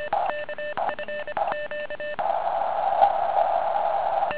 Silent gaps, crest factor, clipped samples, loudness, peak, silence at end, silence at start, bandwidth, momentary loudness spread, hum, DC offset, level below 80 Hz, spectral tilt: none; 20 dB; under 0.1%; -26 LUFS; -6 dBFS; 0 s; 0 s; 4 kHz; 10 LU; none; 1%; -60 dBFS; -7 dB/octave